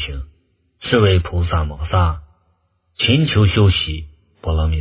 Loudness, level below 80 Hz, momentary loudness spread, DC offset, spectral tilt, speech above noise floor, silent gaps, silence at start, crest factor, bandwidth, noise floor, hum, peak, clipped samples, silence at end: -17 LUFS; -26 dBFS; 17 LU; under 0.1%; -10.5 dB/octave; 47 dB; none; 0 s; 18 dB; 4 kHz; -63 dBFS; none; 0 dBFS; under 0.1%; 0 s